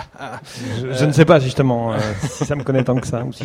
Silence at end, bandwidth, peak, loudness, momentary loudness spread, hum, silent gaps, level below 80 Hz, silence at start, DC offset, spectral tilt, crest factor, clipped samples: 0 s; 14 kHz; 0 dBFS; -17 LUFS; 18 LU; none; none; -46 dBFS; 0 s; under 0.1%; -6.5 dB/octave; 18 dB; under 0.1%